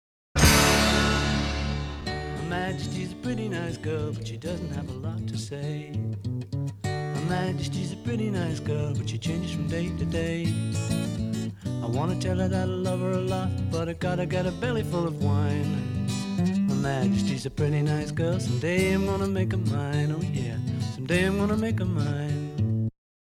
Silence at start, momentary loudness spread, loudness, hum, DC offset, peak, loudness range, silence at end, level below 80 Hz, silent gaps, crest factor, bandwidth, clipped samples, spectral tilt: 0.35 s; 8 LU; -27 LUFS; none; under 0.1%; -6 dBFS; 6 LU; 0.4 s; -40 dBFS; none; 20 dB; 16 kHz; under 0.1%; -5.5 dB/octave